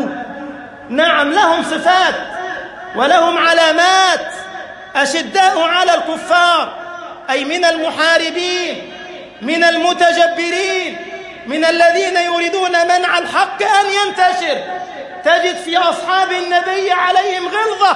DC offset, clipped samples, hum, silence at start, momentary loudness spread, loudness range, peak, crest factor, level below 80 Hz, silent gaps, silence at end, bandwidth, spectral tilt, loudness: under 0.1%; under 0.1%; none; 0 s; 16 LU; 3 LU; 0 dBFS; 14 dB; -58 dBFS; none; 0 s; 11.5 kHz; -1.5 dB/octave; -13 LUFS